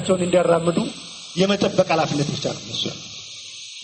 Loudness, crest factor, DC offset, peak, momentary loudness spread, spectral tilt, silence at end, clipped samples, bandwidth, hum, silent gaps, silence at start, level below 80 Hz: -21 LUFS; 18 dB; under 0.1%; -4 dBFS; 16 LU; -5 dB/octave; 0 s; under 0.1%; 8.8 kHz; none; none; 0 s; -56 dBFS